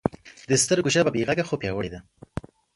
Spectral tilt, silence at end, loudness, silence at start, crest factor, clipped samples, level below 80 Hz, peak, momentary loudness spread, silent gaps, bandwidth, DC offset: -4 dB/octave; 0.35 s; -24 LUFS; 0.05 s; 22 dB; under 0.1%; -50 dBFS; -4 dBFS; 18 LU; none; 11.5 kHz; under 0.1%